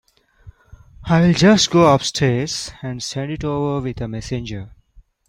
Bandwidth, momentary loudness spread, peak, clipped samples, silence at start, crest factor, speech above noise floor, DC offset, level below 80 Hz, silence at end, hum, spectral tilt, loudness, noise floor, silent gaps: 11.5 kHz; 15 LU; -2 dBFS; under 0.1%; 0.45 s; 18 dB; 33 dB; under 0.1%; -42 dBFS; 0.6 s; none; -5 dB/octave; -18 LUFS; -51 dBFS; none